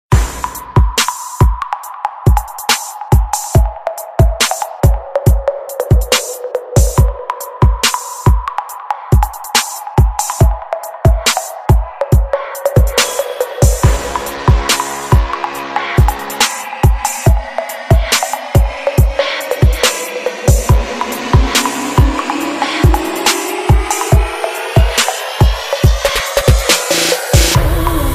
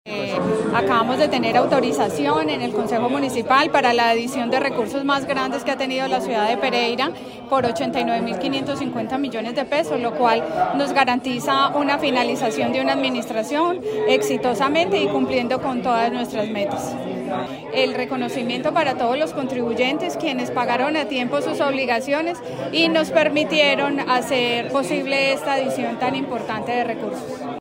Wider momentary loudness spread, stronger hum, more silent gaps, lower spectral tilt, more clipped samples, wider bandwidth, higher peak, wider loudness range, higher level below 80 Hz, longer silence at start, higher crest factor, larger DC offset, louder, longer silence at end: about the same, 8 LU vs 7 LU; neither; neither; about the same, -4 dB/octave vs -4.5 dB/octave; neither; about the same, 16 kHz vs 16 kHz; first, 0 dBFS vs -4 dBFS; about the same, 2 LU vs 3 LU; first, -16 dBFS vs -60 dBFS; about the same, 0.1 s vs 0.05 s; about the same, 12 dB vs 16 dB; neither; first, -14 LUFS vs -20 LUFS; about the same, 0 s vs 0 s